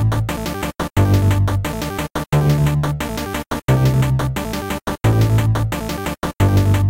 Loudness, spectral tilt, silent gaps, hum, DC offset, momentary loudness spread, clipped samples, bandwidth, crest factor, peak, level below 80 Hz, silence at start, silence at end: -18 LUFS; -6.5 dB/octave; none; none; 0.2%; 9 LU; under 0.1%; 16.5 kHz; 12 dB; -4 dBFS; -30 dBFS; 0 s; 0 s